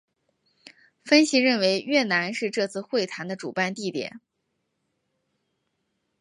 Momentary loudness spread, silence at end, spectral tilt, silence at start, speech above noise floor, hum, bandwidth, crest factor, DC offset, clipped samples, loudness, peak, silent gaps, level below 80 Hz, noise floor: 12 LU; 2.05 s; -3.5 dB/octave; 1.05 s; 53 dB; none; 11.5 kHz; 22 dB; under 0.1%; under 0.1%; -24 LUFS; -6 dBFS; none; -76 dBFS; -77 dBFS